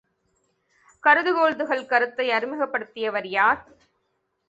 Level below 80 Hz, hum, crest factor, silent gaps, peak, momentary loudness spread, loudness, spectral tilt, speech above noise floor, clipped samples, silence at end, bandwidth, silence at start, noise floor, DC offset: -68 dBFS; none; 22 dB; none; -2 dBFS; 9 LU; -22 LUFS; -4.5 dB/octave; 51 dB; under 0.1%; 0.9 s; 8 kHz; 1.05 s; -74 dBFS; under 0.1%